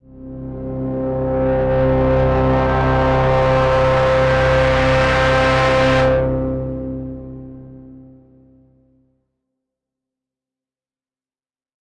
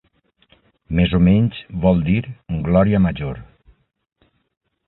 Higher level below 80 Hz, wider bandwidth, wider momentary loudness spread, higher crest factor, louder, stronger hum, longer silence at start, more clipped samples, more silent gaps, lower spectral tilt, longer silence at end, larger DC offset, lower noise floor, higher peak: first, -28 dBFS vs -34 dBFS; first, 9.8 kHz vs 4.1 kHz; first, 16 LU vs 13 LU; second, 12 dB vs 18 dB; about the same, -16 LUFS vs -18 LUFS; neither; second, 0.15 s vs 0.9 s; neither; neither; second, -7 dB/octave vs -13 dB/octave; first, 3.9 s vs 1.45 s; neither; first, under -90 dBFS vs -62 dBFS; second, -6 dBFS vs -2 dBFS